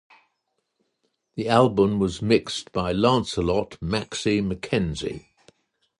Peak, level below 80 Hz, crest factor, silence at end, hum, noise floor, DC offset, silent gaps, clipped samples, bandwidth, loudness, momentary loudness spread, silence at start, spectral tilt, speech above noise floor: -4 dBFS; -46 dBFS; 20 dB; 0.8 s; none; -76 dBFS; under 0.1%; none; under 0.1%; 11.5 kHz; -23 LUFS; 12 LU; 1.35 s; -5.5 dB/octave; 53 dB